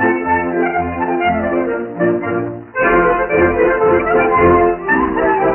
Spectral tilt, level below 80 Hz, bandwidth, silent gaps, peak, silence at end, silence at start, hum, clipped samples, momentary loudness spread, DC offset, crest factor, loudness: -5.5 dB/octave; -38 dBFS; 3.2 kHz; none; -2 dBFS; 0 s; 0 s; none; under 0.1%; 7 LU; under 0.1%; 12 dB; -14 LUFS